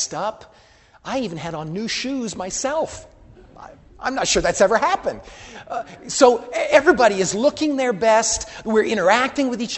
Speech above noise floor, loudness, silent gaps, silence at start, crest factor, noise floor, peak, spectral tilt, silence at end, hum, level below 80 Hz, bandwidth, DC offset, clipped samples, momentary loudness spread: 31 dB; -19 LUFS; none; 0 s; 20 dB; -51 dBFS; 0 dBFS; -3 dB/octave; 0 s; none; -48 dBFS; 8.6 kHz; under 0.1%; under 0.1%; 15 LU